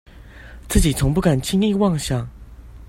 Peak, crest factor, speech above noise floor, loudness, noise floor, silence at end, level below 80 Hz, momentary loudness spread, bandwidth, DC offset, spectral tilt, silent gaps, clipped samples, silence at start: 0 dBFS; 20 dB; 22 dB; -19 LUFS; -40 dBFS; 0.05 s; -30 dBFS; 8 LU; 16 kHz; under 0.1%; -5.5 dB/octave; none; under 0.1%; 0.15 s